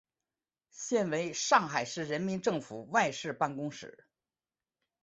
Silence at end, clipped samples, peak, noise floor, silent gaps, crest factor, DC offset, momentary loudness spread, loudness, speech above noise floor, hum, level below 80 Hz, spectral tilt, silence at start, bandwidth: 1.1 s; under 0.1%; -10 dBFS; under -90 dBFS; none; 24 dB; under 0.1%; 13 LU; -32 LUFS; over 58 dB; none; -74 dBFS; -3.5 dB/octave; 0.75 s; 8.2 kHz